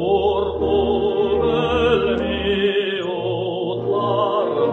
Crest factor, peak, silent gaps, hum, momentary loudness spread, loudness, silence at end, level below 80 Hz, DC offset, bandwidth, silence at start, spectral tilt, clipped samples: 14 dB; -6 dBFS; none; none; 5 LU; -20 LUFS; 0 s; -38 dBFS; under 0.1%; 6.6 kHz; 0 s; -7.5 dB/octave; under 0.1%